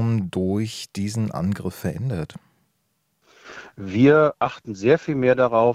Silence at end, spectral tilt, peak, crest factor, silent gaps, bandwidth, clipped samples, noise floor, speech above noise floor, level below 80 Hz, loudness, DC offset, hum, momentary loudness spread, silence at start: 0 s; -7 dB/octave; -4 dBFS; 18 dB; none; 15 kHz; under 0.1%; -71 dBFS; 50 dB; -56 dBFS; -21 LUFS; under 0.1%; none; 17 LU; 0 s